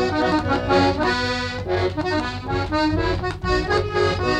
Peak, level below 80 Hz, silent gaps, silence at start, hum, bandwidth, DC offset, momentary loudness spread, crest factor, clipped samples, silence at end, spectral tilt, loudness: -6 dBFS; -34 dBFS; none; 0 s; none; 10.5 kHz; under 0.1%; 6 LU; 14 dB; under 0.1%; 0 s; -6 dB/octave; -21 LUFS